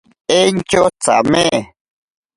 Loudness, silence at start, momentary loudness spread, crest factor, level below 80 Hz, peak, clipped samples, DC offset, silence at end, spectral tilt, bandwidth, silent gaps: -14 LUFS; 0.3 s; 4 LU; 16 dB; -46 dBFS; 0 dBFS; under 0.1%; under 0.1%; 0.7 s; -3.5 dB/octave; 11.5 kHz; none